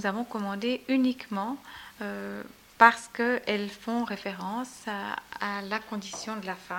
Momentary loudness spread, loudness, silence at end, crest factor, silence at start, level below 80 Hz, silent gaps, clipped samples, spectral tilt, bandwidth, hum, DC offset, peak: 16 LU; -29 LUFS; 0 s; 26 dB; 0 s; -68 dBFS; none; under 0.1%; -4.5 dB/octave; 17 kHz; none; under 0.1%; -4 dBFS